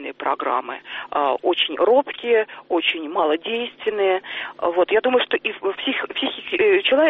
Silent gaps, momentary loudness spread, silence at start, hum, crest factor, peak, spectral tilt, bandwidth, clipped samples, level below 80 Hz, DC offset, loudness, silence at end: none; 8 LU; 0 s; none; 16 dB; -6 dBFS; -5.5 dB/octave; 4.3 kHz; under 0.1%; -66 dBFS; under 0.1%; -21 LUFS; 0 s